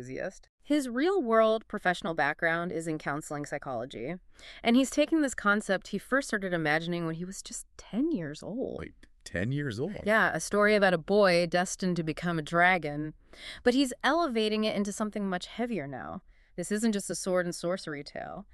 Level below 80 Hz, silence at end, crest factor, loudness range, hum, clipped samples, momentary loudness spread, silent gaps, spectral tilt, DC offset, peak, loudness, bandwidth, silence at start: -58 dBFS; 0.1 s; 20 dB; 6 LU; none; under 0.1%; 15 LU; 0.49-0.58 s; -4.5 dB/octave; under 0.1%; -10 dBFS; -29 LUFS; 13.5 kHz; 0 s